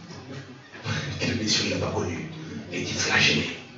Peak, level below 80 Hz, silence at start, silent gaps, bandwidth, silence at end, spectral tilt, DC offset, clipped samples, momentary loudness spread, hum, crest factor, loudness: -6 dBFS; -58 dBFS; 0 s; none; 8 kHz; 0 s; -3 dB/octave; under 0.1%; under 0.1%; 20 LU; none; 20 dB; -25 LUFS